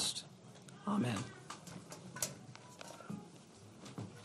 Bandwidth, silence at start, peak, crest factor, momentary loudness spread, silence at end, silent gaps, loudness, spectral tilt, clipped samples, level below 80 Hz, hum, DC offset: 13.5 kHz; 0 s; -20 dBFS; 24 dB; 18 LU; 0 s; none; -43 LUFS; -3.5 dB/octave; under 0.1%; -80 dBFS; none; under 0.1%